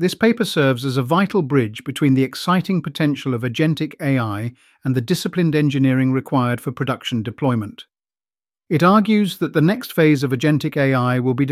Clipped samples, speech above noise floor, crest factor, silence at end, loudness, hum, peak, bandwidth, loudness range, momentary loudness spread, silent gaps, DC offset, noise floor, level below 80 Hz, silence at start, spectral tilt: under 0.1%; over 72 dB; 16 dB; 0 s; -19 LUFS; none; -2 dBFS; 15.5 kHz; 3 LU; 7 LU; none; under 0.1%; under -90 dBFS; -60 dBFS; 0 s; -6.5 dB/octave